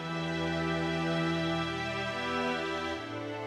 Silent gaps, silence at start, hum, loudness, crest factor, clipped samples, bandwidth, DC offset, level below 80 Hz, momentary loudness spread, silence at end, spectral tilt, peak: none; 0 s; none; -32 LUFS; 14 dB; under 0.1%; 12 kHz; under 0.1%; -56 dBFS; 4 LU; 0 s; -5.5 dB/octave; -20 dBFS